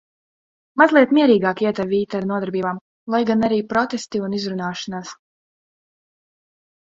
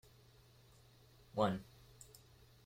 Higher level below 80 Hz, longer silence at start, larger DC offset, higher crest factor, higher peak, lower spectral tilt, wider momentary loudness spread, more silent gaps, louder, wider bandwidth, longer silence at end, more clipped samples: first, -60 dBFS vs -70 dBFS; second, 0.75 s vs 1.35 s; neither; about the same, 20 dB vs 24 dB; first, 0 dBFS vs -22 dBFS; about the same, -6 dB/octave vs -6.5 dB/octave; second, 15 LU vs 27 LU; first, 2.81-3.07 s vs none; first, -19 LUFS vs -40 LUFS; second, 7.8 kHz vs 16.5 kHz; first, 1.7 s vs 0.6 s; neither